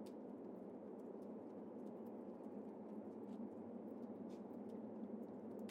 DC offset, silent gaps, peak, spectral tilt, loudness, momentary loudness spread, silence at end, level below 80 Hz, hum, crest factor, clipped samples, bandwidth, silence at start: under 0.1%; none; -40 dBFS; -8.5 dB/octave; -53 LUFS; 2 LU; 0 s; under -90 dBFS; none; 12 dB; under 0.1%; 16 kHz; 0 s